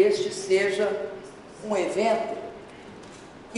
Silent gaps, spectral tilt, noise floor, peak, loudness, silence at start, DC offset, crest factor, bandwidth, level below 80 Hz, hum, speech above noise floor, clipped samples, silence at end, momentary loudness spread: none; -4 dB/octave; -45 dBFS; -8 dBFS; -26 LUFS; 0 s; under 0.1%; 18 dB; 11.5 kHz; -62 dBFS; none; 20 dB; under 0.1%; 0 s; 21 LU